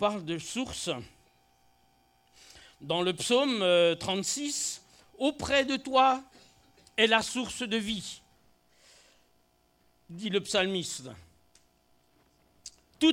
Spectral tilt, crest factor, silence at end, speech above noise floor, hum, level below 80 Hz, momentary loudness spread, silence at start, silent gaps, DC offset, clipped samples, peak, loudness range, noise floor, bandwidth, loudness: -3 dB/octave; 24 dB; 0 s; 39 dB; none; -62 dBFS; 19 LU; 0 s; none; under 0.1%; under 0.1%; -8 dBFS; 7 LU; -68 dBFS; 16 kHz; -29 LUFS